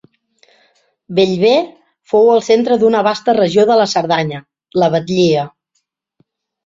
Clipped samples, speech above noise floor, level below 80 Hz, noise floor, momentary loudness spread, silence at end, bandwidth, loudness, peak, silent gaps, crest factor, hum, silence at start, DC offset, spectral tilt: under 0.1%; 56 dB; -58 dBFS; -68 dBFS; 10 LU; 1.15 s; 7.8 kHz; -13 LUFS; 0 dBFS; none; 14 dB; none; 1.1 s; under 0.1%; -5.5 dB/octave